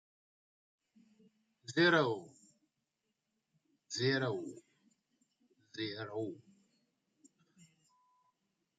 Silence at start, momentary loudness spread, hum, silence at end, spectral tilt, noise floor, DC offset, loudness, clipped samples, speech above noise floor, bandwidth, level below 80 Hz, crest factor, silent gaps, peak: 1.7 s; 22 LU; none; 2.45 s; -5 dB/octave; -86 dBFS; under 0.1%; -35 LUFS; under 0.1%; 52 dB; 9.2 kHz; -86 dBFS; 24 dB; none; -16 dBFS